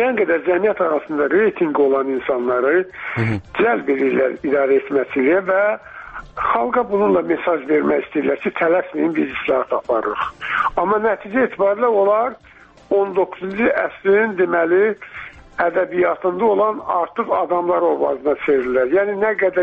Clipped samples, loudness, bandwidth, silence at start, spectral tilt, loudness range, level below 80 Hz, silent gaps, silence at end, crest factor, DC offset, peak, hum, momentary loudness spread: under 0.1%; -18 LUFS; 4.9 kHz; 0 s; -8.5 dB/octave; 1 LU; -52 dBFS; none; 0 s; 16 dB; under 0.1%; -2 dBFS; none; 5 LU